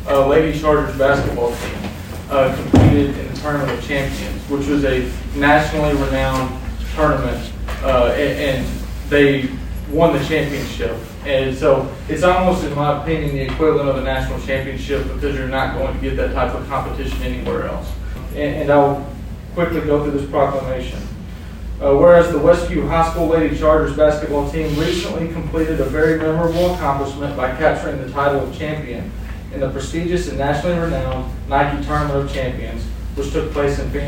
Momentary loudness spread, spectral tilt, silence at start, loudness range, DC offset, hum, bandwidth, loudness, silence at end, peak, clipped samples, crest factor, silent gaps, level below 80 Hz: 12 LU; -6.5 dB/octave; 0 s; 5 LU; under 0.1%; none; 16.5 kHz; -18 LUFS; 0 s; 0 dBFS; under 0.1%; 16 dB; none; -28 dBFS